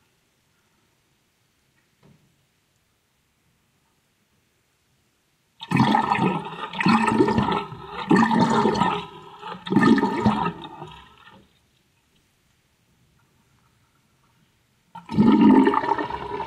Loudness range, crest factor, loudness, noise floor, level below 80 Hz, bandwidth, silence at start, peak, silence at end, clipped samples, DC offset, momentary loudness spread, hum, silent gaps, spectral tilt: 7 LU; 20 dB; -20 LUFS; -68 dBFS; -54 dBFS; 10.5 kHz; 5.6 s; -4 dBFS; 0 s; under 0.1%; under 0.1%; 22 LU; none; none; -6.5 dB/octave